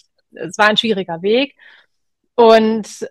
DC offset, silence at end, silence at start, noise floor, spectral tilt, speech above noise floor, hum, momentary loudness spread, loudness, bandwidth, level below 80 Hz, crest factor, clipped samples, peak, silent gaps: under 0.1%; 0 s; 0.4 s; -73 dBFS; -4 dB/octave; 58 dB; none; 14 LU; -14 LUFS; 12 kHz; -62 dBFS; 16 dB; 0.2%; 0 dBFS; none